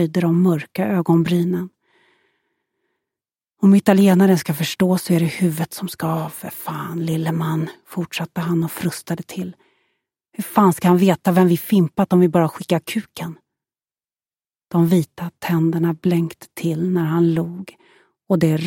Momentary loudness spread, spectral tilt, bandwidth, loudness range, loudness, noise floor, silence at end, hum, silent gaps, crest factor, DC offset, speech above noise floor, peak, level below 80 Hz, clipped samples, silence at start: 14 LU; -7 dB/octave; 17 kHz; 7 LU; -19 LUFS; under -90 dBFS; 0 s; none; none; 18 dB; under 0.1%; over 72 dB; 0 dBFS; -60 dBFS; under 0.1%; 0 s